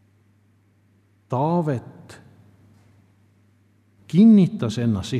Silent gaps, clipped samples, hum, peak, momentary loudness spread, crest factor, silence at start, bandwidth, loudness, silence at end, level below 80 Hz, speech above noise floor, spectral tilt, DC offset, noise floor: none; under 0.1%; none; -6 dBFS; 16 LU; 18 dB; 1.3 s; 9.6 kHz; -19 LUFS; 0 s; -62 dBFS; 41 dB; -8 dB/octave; under 0.1%; -60 dBFS